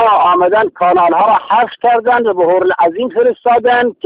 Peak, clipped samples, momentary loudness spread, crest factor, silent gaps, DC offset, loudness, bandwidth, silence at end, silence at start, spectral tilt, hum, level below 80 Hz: -2 dBFS; under 0.1%; 4 LU; 10 dB; none; under 0.1%; -11 LUFS; 4.9 kHz; 0.15 s; 0 s; -9 dB/octave; none; -54 dBFS